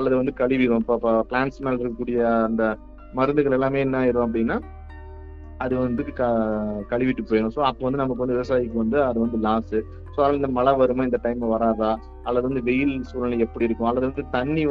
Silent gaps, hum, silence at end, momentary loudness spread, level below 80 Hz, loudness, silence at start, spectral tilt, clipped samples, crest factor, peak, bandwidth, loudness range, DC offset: none; none; 0 s; 7 LU; -40 dBFS; -23 LUFS; 0 s; -9 dB/octave; under 0.1%; 16 dB; -6 dBFS; 6.4 kHz; 2 LU; under 0.1%